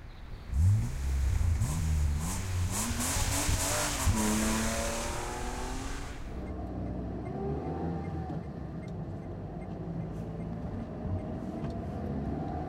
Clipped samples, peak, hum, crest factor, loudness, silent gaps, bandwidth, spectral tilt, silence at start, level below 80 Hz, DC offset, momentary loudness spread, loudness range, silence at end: under 0.1%; -16 dBFS; none; 16 dB; -33 LUFS; none; 16.5 kHz; -4.5 dB/octave; 0 s; -38 dBFS; under 0.1%; 11 LU; 8 LU; 0 s